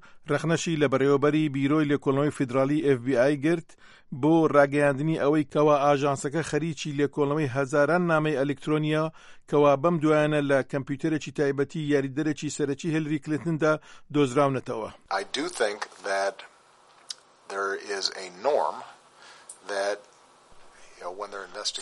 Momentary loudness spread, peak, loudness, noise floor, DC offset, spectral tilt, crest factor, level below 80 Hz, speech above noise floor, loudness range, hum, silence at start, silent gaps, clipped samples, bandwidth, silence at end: 12 LU; -6 dBFS; -26 LUFS; -57 dBFS; under 0.1%; -6 dB/octave; 20 dB; -64 dBFS; 32 dB; 8 LU; none; 0.15 s; none; under 0.1%; 11.5 kHz; 0 s